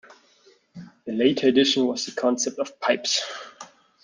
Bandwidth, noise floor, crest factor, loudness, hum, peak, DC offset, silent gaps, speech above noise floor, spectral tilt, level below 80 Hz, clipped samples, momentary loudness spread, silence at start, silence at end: 10 kHz; -58 dBFS; 20 dB; -23 LUFS; none; -6 dBFS; under 0.1%; none; 36 dB; -3 dB/octave; -70 dBFS; under 0.1%; 16 LU; 0.75 s; 0.35 s